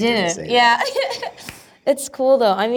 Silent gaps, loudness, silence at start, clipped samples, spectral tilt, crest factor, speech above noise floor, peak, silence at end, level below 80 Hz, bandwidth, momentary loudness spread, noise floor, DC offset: none; -18 LUFS; 0 s; under 0.1%; -3 dB/octave; 16 dB; 22 dB; -4 dBFS; 0 s; -58 dBFS; over 20 kHz; 16 LU; -39 dBFS; under 0.1%